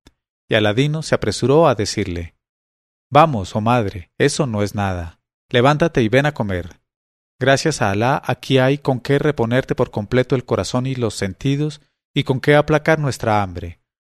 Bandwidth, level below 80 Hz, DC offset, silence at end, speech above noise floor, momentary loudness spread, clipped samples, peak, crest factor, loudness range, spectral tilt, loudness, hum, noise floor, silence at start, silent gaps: 13.5 kHz; -44 dBFS; under 0.1%; 0.35 s; over 73 dB; 10 LU; under 0.1%; 0 dBFS; 18 dB; 2 LU; -5.5 dB/octave; -18 LUFS; none; under -90 dBFS; 0.5 s; 2.49-3.10 s, 5.34-5.49 s, 6.96-7.39 s, 12.05-12.14 s